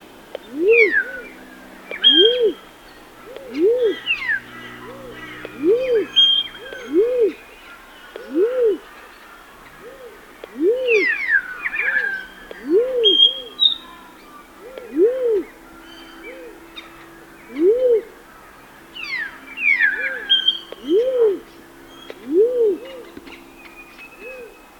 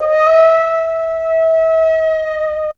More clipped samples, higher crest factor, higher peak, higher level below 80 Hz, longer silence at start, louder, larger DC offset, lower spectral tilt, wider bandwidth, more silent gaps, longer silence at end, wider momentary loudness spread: neither; first, 20 dB vs 12 dB; about the same, -2 dBFS vs 0 dBFS; second, -56 dBFS vs -48 dBFS; first, 0.45 s vs 0 s; second, -17 LUFS vs -13 LUFS; neither; about the same, -3 dB/octave vs -3 dB/octave; first, 19 kHz vs 6.8 kHz; neither; first, 0.3 s vs 0.05 s; first, 25 LU vs 8 LU